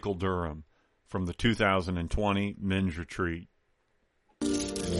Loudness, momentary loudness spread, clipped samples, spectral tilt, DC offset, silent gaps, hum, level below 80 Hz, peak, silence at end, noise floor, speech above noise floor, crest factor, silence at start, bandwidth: -31 LUFS; 10 LU; under 0.1%; -5.5 dB/octave; under 0.1%; none; none; -46 dBFS; -12 dBFS; 0 s; -72 dBFS; 43 dB; 20 dB; 0.05 s; 11.5 kHz